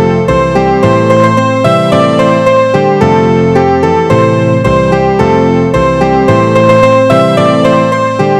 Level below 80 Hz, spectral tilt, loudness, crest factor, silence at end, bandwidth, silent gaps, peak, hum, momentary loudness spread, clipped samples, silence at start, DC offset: -30 dBFS; -7 dB/octave; -8 LUFS; 8 dB; 0 s; 12 kHz; none; 0 dBFS; none; 3 LU; 0.7%; 0 s; 0.1%